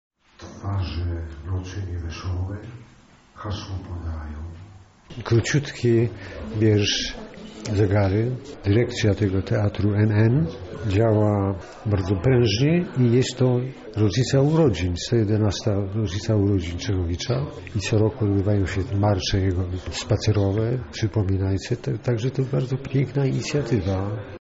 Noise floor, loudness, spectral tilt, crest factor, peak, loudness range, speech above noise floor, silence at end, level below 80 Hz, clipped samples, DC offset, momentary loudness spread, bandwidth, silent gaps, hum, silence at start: -43 dBFS; -23 LUFS; -6.5 dB/octave; 14 dB; -8 dBFS; 10 LU; 21 dB; 0 s; -42 dBFS; under 0.1%; under 0.1%; 13 LU; 8 kHz; none; none; 0.4 s